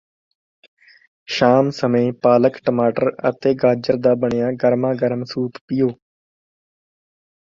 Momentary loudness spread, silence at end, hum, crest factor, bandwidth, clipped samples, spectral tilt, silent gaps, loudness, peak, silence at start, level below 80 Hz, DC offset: 8 LU; 1.6 s; none; 18 dB; 7.4 kHz; under 0.1%; -7 dB/octave; 5.61-5.68 s; -18 LUFS; -2 dBFS; 1.3 s; -58 dBFS; under 0.1%